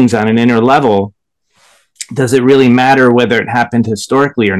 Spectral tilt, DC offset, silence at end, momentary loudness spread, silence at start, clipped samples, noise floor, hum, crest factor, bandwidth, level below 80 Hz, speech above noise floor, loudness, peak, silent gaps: -6 dB/octave; 0.2%; 0 s; 8 LU; 0 s; 1%; -55 dBFS; none; 10 dB; 12.5 kHz; -46 dBFS; 45 dB; -10 LUFS; 0 dBFS; none